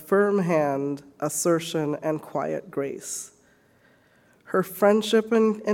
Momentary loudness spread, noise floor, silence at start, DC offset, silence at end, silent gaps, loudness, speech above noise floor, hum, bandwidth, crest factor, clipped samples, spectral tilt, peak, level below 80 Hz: 11 LU; -60 dBFS; 0 s; under 0.1%; 0 s; none; -25 LUFS; 36 dB; none; 18 kHz; 18 dB; under 0.1%; -5 dB/octave; -6 dBFS; -70 dBFS